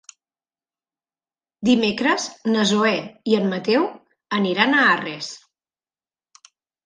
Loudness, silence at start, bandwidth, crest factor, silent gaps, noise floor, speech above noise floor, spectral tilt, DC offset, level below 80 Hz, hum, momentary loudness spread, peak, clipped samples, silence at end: -20 LUFS; 1.6 s; 9.8 kHz; 22 dB; none; under -90 dBFS; over 70 dB; -4 dB/octave; under 0.1%; -68 dBFS; none; 11 LU; -2 dBFS; under 0.1%; 1.5 s